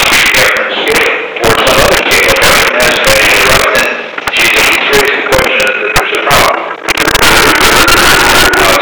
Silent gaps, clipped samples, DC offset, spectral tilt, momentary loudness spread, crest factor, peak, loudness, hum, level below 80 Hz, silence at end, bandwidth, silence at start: none; 2%; 3%; -2 dB/octave; 6 LU; 8 dB; 0 dBFS; -6 LUFS; none; -26 dBFS; 0 s; over 20 kHz; 0 s